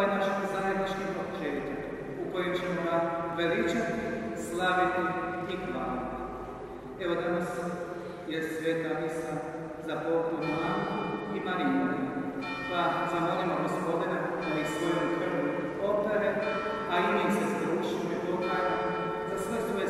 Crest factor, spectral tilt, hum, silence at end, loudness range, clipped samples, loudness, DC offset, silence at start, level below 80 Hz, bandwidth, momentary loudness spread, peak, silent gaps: 16 dB; -6 dB/octave; none; 0 s; 4 LU; under 0.1%; -31 LUFS; under 0.1%; 0 s; -58 dBFS; 15 kHz; 8 LU; -14 dBFS; none